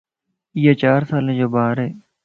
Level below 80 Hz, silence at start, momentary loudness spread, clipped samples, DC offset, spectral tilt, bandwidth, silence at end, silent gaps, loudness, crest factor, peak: -58 dBFS; 0.55 s; 11 LU; under 0.1%; under 0.1%; -9.5 dB/octave; 5.2 kHz; 0.25 s; none; -18 LUFS; 18 dB; -2 dBFS